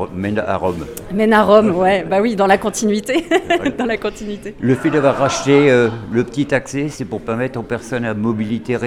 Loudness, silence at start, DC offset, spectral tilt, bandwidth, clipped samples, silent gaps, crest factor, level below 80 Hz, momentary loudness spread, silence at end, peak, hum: -16 LUFS; 0 s; under 0.1%; -5.5 dB/octave; 16 kHz; under 0.1%; none; 16 dB; -44 dBFS; 11 LU; 0 s; 0 dBFS; none